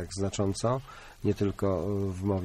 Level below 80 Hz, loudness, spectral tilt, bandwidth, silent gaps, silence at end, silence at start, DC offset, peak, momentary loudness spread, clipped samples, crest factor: -50 dBFS; -31 LUFS; -6.5 dB/octave; 13.5 kHz; none; 0 s; 0 s; under 0.1%; -16 dBFS; 5 LU; under 0.1%; 14 dB